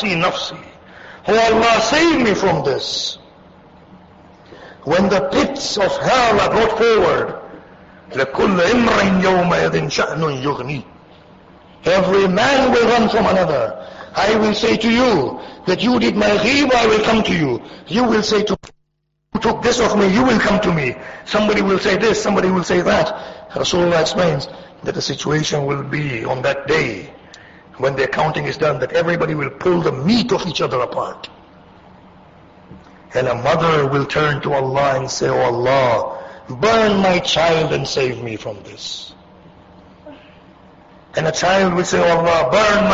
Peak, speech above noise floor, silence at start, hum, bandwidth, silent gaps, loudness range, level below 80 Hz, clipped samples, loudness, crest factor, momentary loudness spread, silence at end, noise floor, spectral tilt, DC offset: -4 dBFS; 54 dB; 0 s; none; 8 kHz; none; 5 LU; -42 dBFS; under 0.1%; -16 LUFS; 14 dB; 13 LU; 0 s; -70 dBFS; -5 dB/octave; under 0.1%